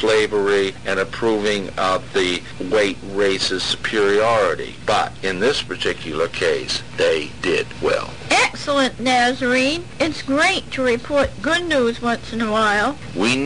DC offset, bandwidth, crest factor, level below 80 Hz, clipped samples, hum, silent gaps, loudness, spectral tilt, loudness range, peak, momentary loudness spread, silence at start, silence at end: 1%; 10.5 kHz; 10 dB; -44 dBFS; under 0.1%; none; none; -19 LUFS; -3.5 dB/octave; 2 LU; -8 dBFS; 6 LU; 0 s; 0 s